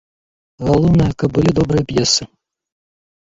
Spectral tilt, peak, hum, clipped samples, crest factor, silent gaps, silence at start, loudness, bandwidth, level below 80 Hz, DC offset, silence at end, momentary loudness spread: -5.5 dB/octave; -2 dBFS; none; under 0.1%; 14 dB; none; 0.6 s; -15 LUFS; 7.8 kHz; -36 dBFS; under 0.1%; 1 s; 4 LU